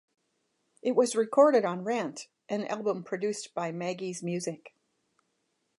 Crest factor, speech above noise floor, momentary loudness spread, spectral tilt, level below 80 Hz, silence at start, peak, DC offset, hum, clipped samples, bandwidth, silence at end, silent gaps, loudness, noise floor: 20 dB; 49 dB; 13 LU; -5 dB/octave; -84 dBFS; 0.85 s; -10 dBFS; under 0.1%; none; under 0.1%; 11.5 kHz; 1.1 s; none; -29 LUFS; -77 dBFS